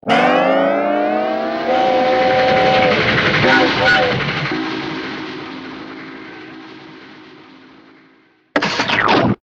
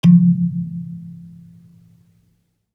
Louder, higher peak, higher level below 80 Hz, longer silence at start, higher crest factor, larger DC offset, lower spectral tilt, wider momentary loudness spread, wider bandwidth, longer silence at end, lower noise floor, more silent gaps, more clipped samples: about the same, -15 LUFS vs -17 LUFS; about the same, 0 dBFS vs -2 dBFS; first, -46 dBFS vs -60 dBFS; about the same, 0.05 s vs 0.05 s; about the same, 16 dB vs 16 dB; neither; second, -5 dB/octave vs -9.5 dB/octave; second, 20 LU vs 27 LU; first, 8.4 kHz vs 5.2 kHz; second, 0.1 s vs 1.5 s; second, -52 dBFS vs -64 dBFS; neither; neither